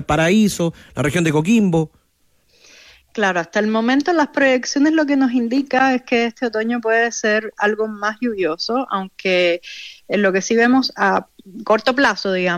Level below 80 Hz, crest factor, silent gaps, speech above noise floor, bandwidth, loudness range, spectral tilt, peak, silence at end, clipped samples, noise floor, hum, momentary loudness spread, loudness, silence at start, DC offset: -50 dBFS; 14 dB; none; 43 dB; 15 kHz; 3 LU; -5 dB/octave; -4 dBFS; 0 s; under 0.1%; -60 dBFS; none; 7 LU; -17 LUFS; 0 s; under 0.1%